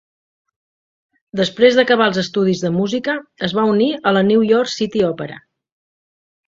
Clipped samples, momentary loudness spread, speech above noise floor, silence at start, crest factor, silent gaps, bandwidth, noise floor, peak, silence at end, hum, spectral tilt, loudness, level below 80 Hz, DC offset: under 0.1%; 9 LU; over 74 dB; 1.35 s; 18 dB; none; 7.8 kHz; under -90 dBFS; 0 dBFS; 1.1 s; none; -5.5 dB/octave; -16 LUFS; -58 dBFS; under 0.1%